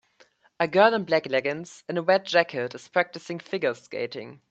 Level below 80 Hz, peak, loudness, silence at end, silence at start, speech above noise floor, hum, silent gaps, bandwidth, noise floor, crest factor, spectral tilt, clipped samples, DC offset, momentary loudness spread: -74 dBFS; -4 dBFS; -25 LUFS; 0.15 s; 0.6 s; 35 dB; none; none; 8.4 kHz; -61 dBFS; 22 dB; -5 dB/octave; under 0.1%; under 0.1%; 13 LU